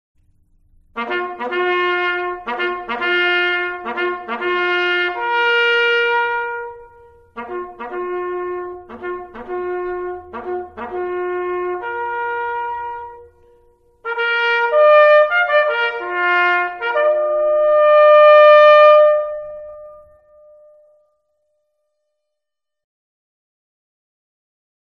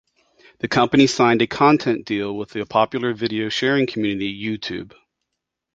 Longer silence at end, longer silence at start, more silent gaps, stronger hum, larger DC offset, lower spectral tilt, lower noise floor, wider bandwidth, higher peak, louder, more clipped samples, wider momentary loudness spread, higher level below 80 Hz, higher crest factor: first, 4.9 s vs 0.9 s; first, 0.95 s vs 0.65 s; neither; neither; neither; about the same, -4 dB/octave vs -5 dB/octave; about the same, -83 dBFS vs -80 dBFS; second, 6 kHz vs 8 kHz; about the same, 0 dBFS vs -2 dBFS; first, -15 LUFS vs -20 LUFS; neither; first, 20 LU vs 12 LU; about the same, -56 dBFS vs -56 dBFS; about the same, 16 dB vs 18 dB